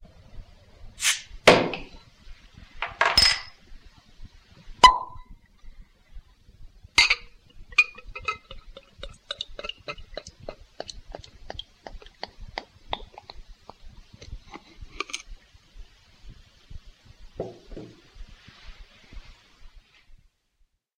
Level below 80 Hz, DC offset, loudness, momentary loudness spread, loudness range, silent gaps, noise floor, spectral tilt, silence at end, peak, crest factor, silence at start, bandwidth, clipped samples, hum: -46 dBFS; under 0.1%; -23 LUFS; 28 LU; 22 LU; none; -68 dBFS; -2 dB/octave; 0.85 s; 0 dBFS; 30 dB; 0.35 s; 16 kHz; under 0.1%; none